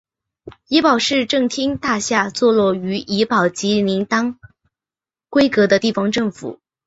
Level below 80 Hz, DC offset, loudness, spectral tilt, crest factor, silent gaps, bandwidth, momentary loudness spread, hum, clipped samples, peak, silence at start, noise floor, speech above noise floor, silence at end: -54 dBFS; under 0.1%; -17 LUFS; -4.5 dB/octave; 16 dB; none; 8 kHz; 7 LU; none; under 0.1%; -2 dBFS; 0.45 s; under -90 dBFS; over 73 dB; 0.3 s